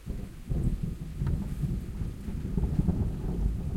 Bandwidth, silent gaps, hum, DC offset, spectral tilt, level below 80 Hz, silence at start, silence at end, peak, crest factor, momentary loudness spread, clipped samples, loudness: 15.5 kHz; none; none; under 0.1%; -9 dB/octave; -34 dBFS; 0 s; 0 s; -12 dBFS; 18 dB; 8 LU; under 0.1%; -33 LUFS